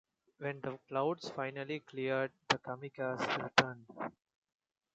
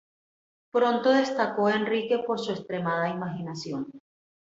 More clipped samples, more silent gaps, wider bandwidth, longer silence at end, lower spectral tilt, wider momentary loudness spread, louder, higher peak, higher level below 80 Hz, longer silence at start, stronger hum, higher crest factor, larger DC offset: neither; neither; first, 8.8 kHz vs 7.8 kHz; first, 0.85 s vs 0.45 s; second, -4.5 dB/octave vs -6 dB/octave; first, 14 LU vs 11 LU; second, -37 LUFS vs -27 LUFS; about the same, -10 dBFS vs -10 dBFS; second, -78 dBFS vs -72 dBFS; second, 0.4 s vs 0.75 s; neither; first, 28 dB vs 18 dB; neither